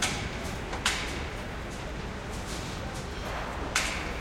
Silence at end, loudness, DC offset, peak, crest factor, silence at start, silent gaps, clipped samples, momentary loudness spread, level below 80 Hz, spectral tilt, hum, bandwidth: 0 s; -33 LUFS; under 0.1%; -8 dBFS; 24 dB; 0 s; none; under 0.1%; 8 LU; -40 dBFS; -3 dB/octave; none; 16.5 kHz